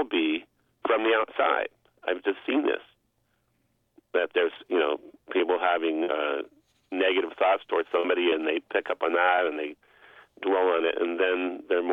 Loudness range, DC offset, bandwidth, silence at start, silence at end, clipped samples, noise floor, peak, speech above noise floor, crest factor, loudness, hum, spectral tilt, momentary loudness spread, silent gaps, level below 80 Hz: 4 LU; under 0.1%; 4 kHz; 0 s; 0 s; under 0.1%; -72 dBFS; -10 dBFS; 46 dB; 18 dB; -27 LUFS; none; -5.5 dB/octave; 10 LU; none; -72 dBFS